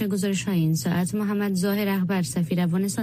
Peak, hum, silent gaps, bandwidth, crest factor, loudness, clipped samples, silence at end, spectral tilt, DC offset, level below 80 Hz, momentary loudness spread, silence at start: -12 dBFS; none; none; 15.5 kHz; 12 dB; -24 LUFS; under 0.1%; 0 s; -6 dB/octave; under 0.1%; -58 dBFS; 2 LU; 0 s